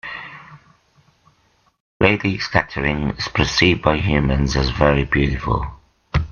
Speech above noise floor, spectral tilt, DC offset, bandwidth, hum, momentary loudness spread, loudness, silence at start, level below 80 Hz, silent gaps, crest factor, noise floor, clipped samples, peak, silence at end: 42 dB; -5.5 dB/octave; under 0.1%; 7.2 kHz; none; 9 LU; -18 LUFS; 0.05 s; -30 dBFS; 1.80-2.00 s; 20 dB; -60 dBFS; under 0.1%; 0 dBFS; 0 s